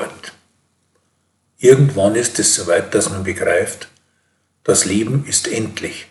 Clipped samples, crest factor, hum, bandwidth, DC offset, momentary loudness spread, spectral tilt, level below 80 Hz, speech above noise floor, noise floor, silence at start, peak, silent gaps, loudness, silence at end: under 0.1%; 18 dB; none; 12.5 kHz; under 0.1%; 14 LU; -4 dB/octave; -58 dBFS; 49 dB; -65 dBFS; 0 s; 0 dBFS; none; -16 LUFS; 0.05 s